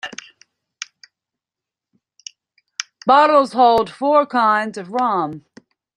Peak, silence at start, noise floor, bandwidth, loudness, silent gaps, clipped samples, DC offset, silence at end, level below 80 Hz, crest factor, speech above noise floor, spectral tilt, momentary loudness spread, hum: -2 dBFS; 0.05 s; -87 dBFS; 11 kHz; -16 LUFS; none; under 0.1%; under 0.1%; 0.55 s; -62 dBFS; 18 dB; 72 dB; -4 dB/octave; 25 LU; none